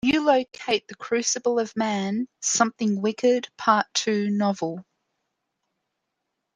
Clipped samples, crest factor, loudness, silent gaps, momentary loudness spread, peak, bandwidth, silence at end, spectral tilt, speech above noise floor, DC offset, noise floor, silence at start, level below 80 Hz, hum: under 0.1%; 20 dB; -24 LUFS; none; 6 LU; -4 dBFS; 10 kHz; 1.75 s; -3.5 dB/octave; 57 dB; under 0.1%; -80 dBFS; 0.05 s; -66 dBFS; none